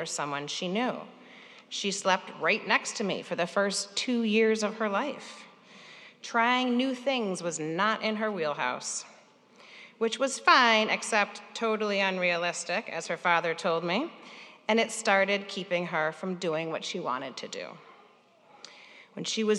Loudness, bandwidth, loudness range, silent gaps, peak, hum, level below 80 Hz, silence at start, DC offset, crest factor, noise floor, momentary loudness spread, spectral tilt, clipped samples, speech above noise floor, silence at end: -28 LUFS; 12 kHz; 5 LU; none; -6 dBFS; none; -88 dBFS; 0 s; under 0.1%; 24 dB; -60 dBFS; 17 LU; -3 dB/octave; under 0.1%; 31 dB; 0 s